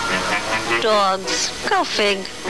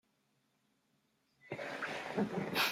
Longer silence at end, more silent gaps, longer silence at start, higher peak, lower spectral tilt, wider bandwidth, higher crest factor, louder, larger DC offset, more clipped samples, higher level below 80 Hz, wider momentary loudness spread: about the same, 0 s vs 0 s; neither; second, 0 s vs 1.45 s; first, -8 dBFS vs -18 dBFS; second, -2 dB/octave vs -4 dB/octave; second, 11 kHz vs 16 kHz; second, 12 dB vs 22 dB; first, -19 LUFS vs -39 LUFS; first, 1% vs under 0.1%; neither; first, -46 dBFS vs -78 dBFS; second, 4 LU vs 10 LU